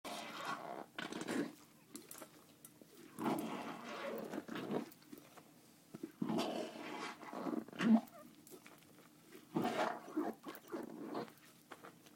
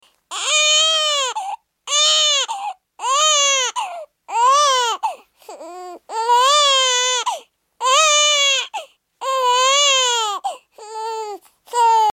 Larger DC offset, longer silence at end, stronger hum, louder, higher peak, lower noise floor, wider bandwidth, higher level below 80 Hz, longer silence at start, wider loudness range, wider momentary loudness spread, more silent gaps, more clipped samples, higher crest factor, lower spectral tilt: neither; about the same, 0 s vs 0 s; neither; second, -42 LUFS vs -15 LUFS; second, -20 dBFS vs -4 dBFS; first, -65 dBFS vs -39 dBFS; about the same, 16.5 kHz vs 17 kHz; second, -88 dBFS vs -78 dBFS; second, 0.05 s vs 0.3 s; about the same, 5 LU vs 3 LU; first, 21 LU vs 18 LU; neither; neither; first, 24 dB vs 14 dB; first, -5 dB/octave vs 4.5 dB/octave